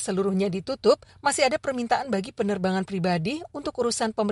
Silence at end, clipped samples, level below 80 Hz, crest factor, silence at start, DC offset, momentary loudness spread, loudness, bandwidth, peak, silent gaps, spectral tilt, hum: 0 s; under 0.1%; -60 dBFS; 18 dB; 0 s; under 0.1%; 5 LU; -26 LUFS; 11.5 kHz; -8 dBFS; none; -4.5 dB/octave; none